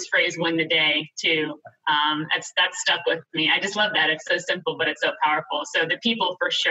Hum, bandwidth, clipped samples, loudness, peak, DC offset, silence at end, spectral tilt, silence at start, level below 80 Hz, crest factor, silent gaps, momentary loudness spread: none; 8.6 kHz; under 0.1%; -22 LUFS; -8 dBFS; under 0.1%; 0 s; -2.5 dB/octave; 0 s; -78 dBFS; 16 dB; none; 5 LU